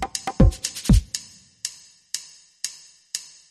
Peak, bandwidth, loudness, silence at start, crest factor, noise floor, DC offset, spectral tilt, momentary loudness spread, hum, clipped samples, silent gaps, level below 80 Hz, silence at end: -2 dBFS; 13.5 kHz; -25 LUFS; 0 s; 22 dB; -39 dBFS; under 0.1%; -5 dB/octave; 13 LU; none; under 0.1%; none; -28 dBFS; 0.3 s